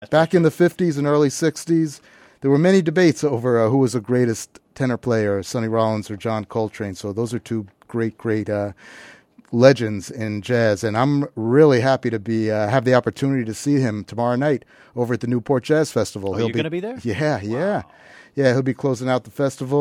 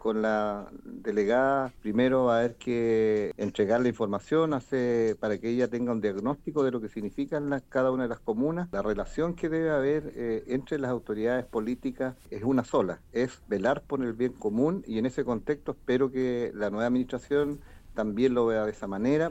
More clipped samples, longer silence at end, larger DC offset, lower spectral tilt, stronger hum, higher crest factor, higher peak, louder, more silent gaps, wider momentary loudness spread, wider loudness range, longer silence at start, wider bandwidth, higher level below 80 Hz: neither; about the same, 0 s vs 0 s; neither; about the same, -6.5 dB/octave vs -7 dB/octave; neither; about the same, 20 dB vs 16 dB; first, 0 dBFS vs -12 dBFS; first, -20 LUFS vs -29 LUFS; neither; first, 11 LU vs 7 LU; about the same, 5 LU vs 3 LU; about the same, 0 s vs 0 s; first, 15.5 kHz vs 8.2 kHz; second, -60 dBFS vs -52 dBFS